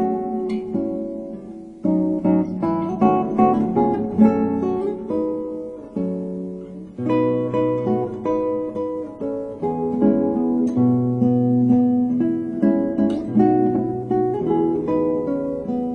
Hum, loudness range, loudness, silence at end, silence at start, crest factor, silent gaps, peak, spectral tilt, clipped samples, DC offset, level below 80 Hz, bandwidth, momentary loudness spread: none; 5 LU; -21 LUFS; 0 s; 0 s; 18 dB; none; -2 dBFS; -10.5 dB/octave; under 0.1%; under 0.1%; -52 dBFS; 6.2 kHz; 11 LU